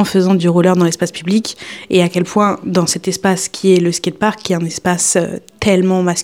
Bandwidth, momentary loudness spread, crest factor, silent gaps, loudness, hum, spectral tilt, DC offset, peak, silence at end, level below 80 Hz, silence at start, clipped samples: 16 kHz; 6 LU; 14 dB; none; -14 LUFS; none; -5 dB/octave; 0.1%; 0 dBFS; 0 s; -50 dBFS; 0 s; under 0.1%